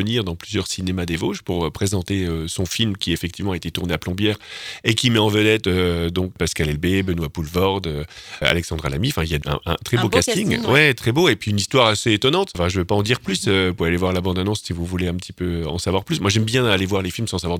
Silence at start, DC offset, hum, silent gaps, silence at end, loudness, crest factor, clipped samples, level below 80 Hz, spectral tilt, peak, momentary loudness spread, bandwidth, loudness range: 0 s; under 0.1%; none; none; 0 s; -20 LUFS; 20 dB; under 0.1%; -38 dBFS; -4.5 dB/octave; -2 dBFS; 9 LU; 18.5 kHz; 5 LU